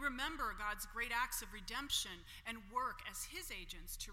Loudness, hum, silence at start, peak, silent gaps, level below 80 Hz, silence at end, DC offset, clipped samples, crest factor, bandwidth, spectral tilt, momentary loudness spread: -42 LUFS; none; 0 s; -24 dBFS; none; -56 dBFS; 0 s; under 0.1%; under 0.1%; 18 dB; 16.5 kHz; -1 dB/octave; 9 LU